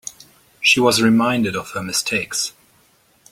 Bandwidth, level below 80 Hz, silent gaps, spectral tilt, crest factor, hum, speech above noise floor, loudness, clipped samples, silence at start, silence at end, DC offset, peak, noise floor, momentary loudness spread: 16 kHz; -56 dBFS; none; -3 dB/octave; 18 dB; none; 39 dB; -17 LUFS; under 0.1%; 0.05 s; 0.8 s; under 0.1%; -2 dBFS; -57 dBFS; 12 LU